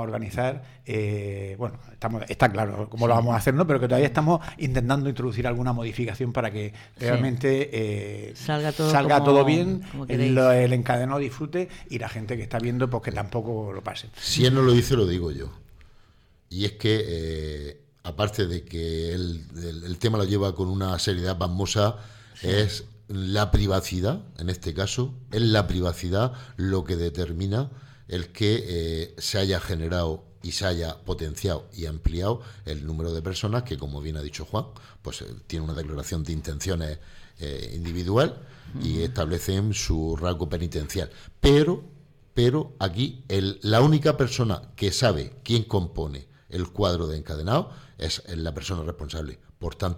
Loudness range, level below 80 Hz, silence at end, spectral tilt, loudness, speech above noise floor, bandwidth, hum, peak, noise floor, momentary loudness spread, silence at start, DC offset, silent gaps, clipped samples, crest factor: 7 LU; -40 dBFS; 0 s; -6 dB/octave; -26 LUFS; 32 dB; 16.5 kHz; none; -6 dBFS; -57 dBFS; 14 LU; 0 s; under 0.1%; none; under 0.1%; 18 dB